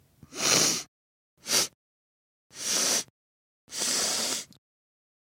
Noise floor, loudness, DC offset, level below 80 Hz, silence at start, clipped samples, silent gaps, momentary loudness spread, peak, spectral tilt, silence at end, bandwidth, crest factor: under -90 dBFS; -26 LUFS; under 0.1%; -72 dBFS; 0.3 s; under 0.1%; 0.88-1.37 s, 1.74-2.50 s, 3.10-3.68 s; 21 LU; -6 dBFS; 0 dB/octave; 0.75 s; 16.5 kHz; 26 dB